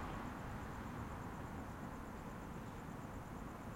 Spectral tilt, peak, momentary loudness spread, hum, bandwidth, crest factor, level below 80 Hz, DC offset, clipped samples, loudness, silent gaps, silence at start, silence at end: -6.5 dB/octave; -34 dBFS; 2 LU; none; 16.5 kHz; 14 dB; -56 dBFS; under 0.1%; under 0.1%; -49 LUFS; none; 0 s; 0 s